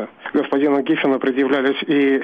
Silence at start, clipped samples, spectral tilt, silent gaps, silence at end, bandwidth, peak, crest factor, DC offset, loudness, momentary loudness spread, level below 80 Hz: 0 s; under 0.1%; -7 dB/octave; none; 0 s; 5 kHz; -8 dBFS; 10 dB; under 0.1%; -18 LUFS; 3 LU; -66 dBFS